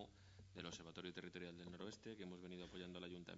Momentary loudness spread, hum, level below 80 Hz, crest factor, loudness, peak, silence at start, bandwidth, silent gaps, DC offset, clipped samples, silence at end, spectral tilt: 3 LU; none; -76 dBFS; 20 dB; -55 LUFS; -34 dBFS; 0 s; 7.6 kHz; none; under 0.1%; under 0.1%; 0 s; -4 dB/octave